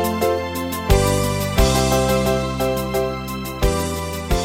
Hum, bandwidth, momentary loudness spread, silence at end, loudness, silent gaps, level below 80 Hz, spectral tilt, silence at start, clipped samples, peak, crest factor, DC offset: none; 17 kHz; 8 LU; 0 s; -20 LUFS; none; -26 dBFS; -5 dB/octave; 0 s; under 0.1%; -2 dBFS; 16 dB; under 0.1%